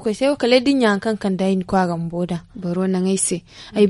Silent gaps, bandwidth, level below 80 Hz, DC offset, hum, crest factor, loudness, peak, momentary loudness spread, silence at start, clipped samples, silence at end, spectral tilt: none; 11.5 kHz; -50 dBFS; under 0.1%; none; 18 dB; -20 LUFS; 0 dBFS; 10 LU; 0 s; under 0.1%; 0 s; -5 dB/octave